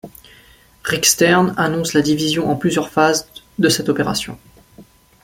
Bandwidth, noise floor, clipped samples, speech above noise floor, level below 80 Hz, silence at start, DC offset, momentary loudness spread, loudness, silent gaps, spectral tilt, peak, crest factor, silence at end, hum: 16.5 kHz; -48 dBFS; under 0.1%; 32 dB; -50 dBFS; 0.05 s; under 0.1%; 10 LU; -16 LUFS; none; -3.5 dB/octave; 0 dBFS; 18 dB; 0.4 s; none